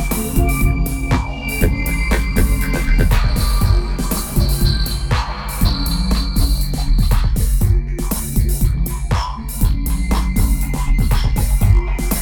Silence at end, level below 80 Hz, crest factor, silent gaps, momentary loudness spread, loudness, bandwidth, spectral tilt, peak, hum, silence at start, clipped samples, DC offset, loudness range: 0 s; -16 dBFS; 14 dB; none; 4 LU; -18 LUFS; over 20 kHz; -5 dB/octave; 0 dBFS; none; 0 s; under 0.1%; under 0.1%; 1 LU